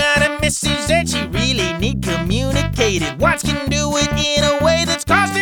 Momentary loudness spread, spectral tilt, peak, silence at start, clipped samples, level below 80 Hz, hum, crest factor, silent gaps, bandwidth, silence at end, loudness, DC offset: 4 LU; -4 dB/octave; 0 dBFS; 0 s; under 0.1%; -30 dBFS; none; 16 dB; none; over 20 kHz; 0 s; -17 LUFS; under 0.1%